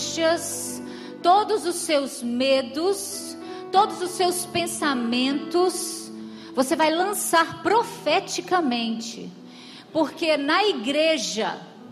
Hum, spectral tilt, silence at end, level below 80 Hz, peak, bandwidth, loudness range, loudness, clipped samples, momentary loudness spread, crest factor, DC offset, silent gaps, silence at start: none; -2.5 dB/octave; 0 s; -72 dBFS; -6 dBFS; 15 kHz; 1 LU; -23 LUFS; under 0.1%; 14 LU; 18 dB; under 0.1%; none; 0 s